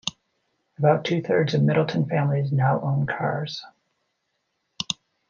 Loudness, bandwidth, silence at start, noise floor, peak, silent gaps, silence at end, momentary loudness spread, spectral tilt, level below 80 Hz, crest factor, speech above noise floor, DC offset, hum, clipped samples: -23 LUFS; 7.4 kHz; 0.05 s; -76 dBFS; -6 dBFS; none; 0.35 s; 11 LU; -6.5 dB/octave; -66 dBFS; 18 dB; 53 dB; under 0.1%; none; under 0.1%